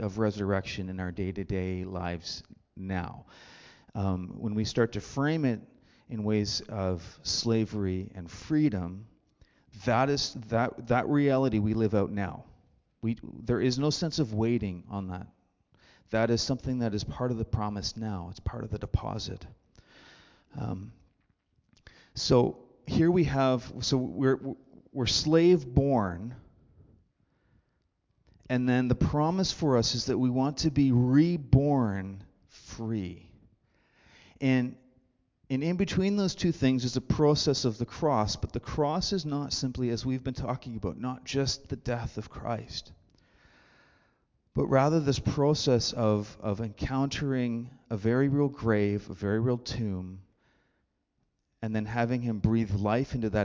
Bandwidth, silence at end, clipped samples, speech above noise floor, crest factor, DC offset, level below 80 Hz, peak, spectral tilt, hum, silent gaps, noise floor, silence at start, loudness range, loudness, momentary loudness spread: 7.6 kHz; 0 s; under 0.1%; 49 dB; 22 dB; under 0.1%; -48 dBFS; -8 dBFS; -6 dB/octave; none; none; -77 dBFS; 0 s; 8 LU; -29 LUFS; 13 LU